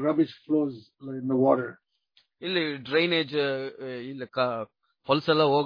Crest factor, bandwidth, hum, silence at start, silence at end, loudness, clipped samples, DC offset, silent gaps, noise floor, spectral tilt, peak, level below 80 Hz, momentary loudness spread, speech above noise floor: 20 dB; 5.2 kHz; none; 0 s; 0 s; -27 LUFS; under 0.1%; under 0.1%; none; -67 dBFS; -7.5 dB/octave; -6 dBFS; -72 dBFS; 15 LU; 41 dB